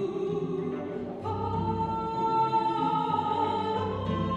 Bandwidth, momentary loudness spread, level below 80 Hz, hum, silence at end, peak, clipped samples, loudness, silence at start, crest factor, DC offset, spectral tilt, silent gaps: 8.4 kHz; 7 LU; -52 dBFS; none; 0 s; -16 dBFS; under 0.1%; -29 LUFS; 0 s; 12 dB; under 0.1%; -8 dB/octave; none